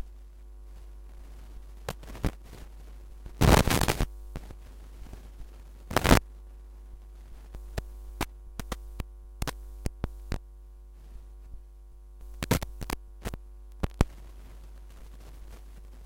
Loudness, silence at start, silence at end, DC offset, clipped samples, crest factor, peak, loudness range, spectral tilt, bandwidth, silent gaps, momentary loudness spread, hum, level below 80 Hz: -30 LUFS; 0 s; 0 s; under 0.1%; under 0.1%; 30 dB; -4 dBFS; 13 LU; -5 dB/octave; 17 kHz; none; 24 LU; none; -38 dBFS